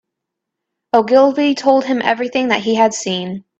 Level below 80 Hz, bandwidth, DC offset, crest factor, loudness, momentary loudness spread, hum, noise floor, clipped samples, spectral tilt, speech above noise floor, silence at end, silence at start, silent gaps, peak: -62 dBFS; 8.4 kHz; under 0.1%; 16 dB; -15 LUFS; 7 LU; none; -79 dBFS; under 0.1%; -4 dB/octave; 65 dB; 0.2 s; 0.95 s; none; 0 dBFS